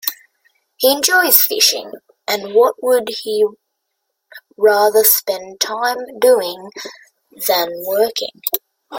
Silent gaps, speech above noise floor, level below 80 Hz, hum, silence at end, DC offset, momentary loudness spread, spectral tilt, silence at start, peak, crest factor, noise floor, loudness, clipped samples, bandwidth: none; 58 dB; -68 dBFS; none; 0 s; under 0.1%; 14 LU; 0 dB/octave; 0.05 s; 0 dBFS; 18 dB; -74 dBFS; -15 LUFS; under 0.1%; 17 kHz